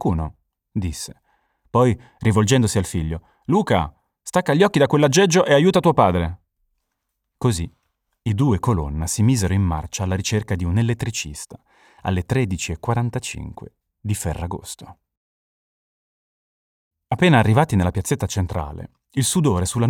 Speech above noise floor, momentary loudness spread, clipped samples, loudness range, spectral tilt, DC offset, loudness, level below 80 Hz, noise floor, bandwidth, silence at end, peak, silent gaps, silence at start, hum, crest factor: 58 dB; 17 LU; under 0.1%; 10 LU; -5.5 dB/octave; under 0.1%; -20 LUFS; -40 dBFS; -77 dBFS; 16.5 kHz; 0 s; -4 dBFS; 15.17-16.91 s; 0 s; none; 18 dB